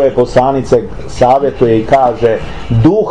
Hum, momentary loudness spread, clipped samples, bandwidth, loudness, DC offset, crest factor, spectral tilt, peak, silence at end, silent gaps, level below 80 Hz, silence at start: none; 5 LU; under 0.1%; 10.5 kHz; -11 LUFS; 4%; 10 dB; -7.5 dB/octave; 0 dBFS; 0 s; none; -30 dBFS; 0 s